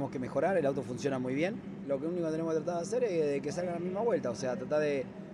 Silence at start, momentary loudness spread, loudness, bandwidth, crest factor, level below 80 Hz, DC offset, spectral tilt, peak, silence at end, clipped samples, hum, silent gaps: 0 s; 5 LU; -33 LUFS; 11.5 kHz; 14 dB; -68 dBFS; under 0.1%; -6.5 dB/octave; -18 dBFS; 0 s; under 0.1%; none; none